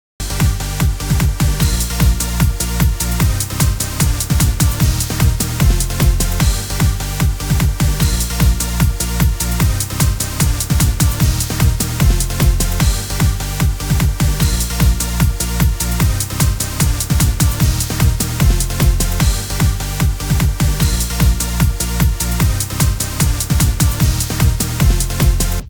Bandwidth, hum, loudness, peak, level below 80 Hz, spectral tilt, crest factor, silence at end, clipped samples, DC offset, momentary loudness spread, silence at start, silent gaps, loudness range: over 20 kHz; none; -16 LUFS; 0 dBFS; -18 dBFS; -4.5 dB/octave; 14 dB; 0 s; under 0.1%; 0.5%; 2 LU; 0.2 s; none; 1 LU